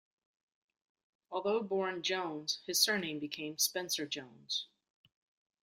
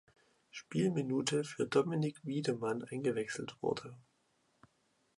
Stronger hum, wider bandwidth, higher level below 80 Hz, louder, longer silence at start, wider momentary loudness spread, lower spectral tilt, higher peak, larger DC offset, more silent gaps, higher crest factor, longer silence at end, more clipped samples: neither; first, 16 kHz vs 11.5 kHz; second, -84 dBFS vs -76 dBFS; about the same, -35 LUFS vs -36 LUFS; first, 1.3 s vs 0.55 s; about the same, 11 LU vs 9 LU; second, -1.5 dB/octave vs -5.5 dB/octave; about the same, -14 dBFS vs -16 dBFS; neither; neither; about the same, 24 dB vs 20 dB; second, 1 s vs 1.15 s; neither